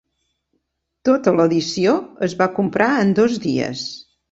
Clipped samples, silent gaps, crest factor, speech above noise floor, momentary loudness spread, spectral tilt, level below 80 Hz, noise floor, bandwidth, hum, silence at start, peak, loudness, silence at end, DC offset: under 0.1%; none; 18 dB; 55 dB; 9 LU; -5.5 dB/octave; -58 dBFS; -73 dBFS; 8 kHz; none; 1.05 s; -2 dBFS; -18 LUFS; 0.35 s; under 0.1%